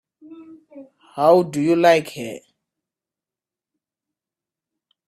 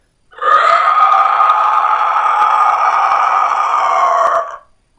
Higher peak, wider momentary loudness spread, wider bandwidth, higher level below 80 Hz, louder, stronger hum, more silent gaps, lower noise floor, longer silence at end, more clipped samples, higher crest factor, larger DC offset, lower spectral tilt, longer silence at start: about the same, -2 dBFS vs 0 dBFS; first, 20 LU vs 4 LU; first, 14.5 kHz vs 8.8 kHz; second, -68 dBFS vs -60 dBFS; second, -17 LUFS vs -11 LUFS; neither; neither; first, -90 dBFS vs -34 dBFS; first, 2.7 s vs 0.4 s; neither; first, 22 dB vs 12 dB; neither; first, -5.5 dB/octave vs -0.5 dB/octave; about the same, 0.3 s vs 0.4 s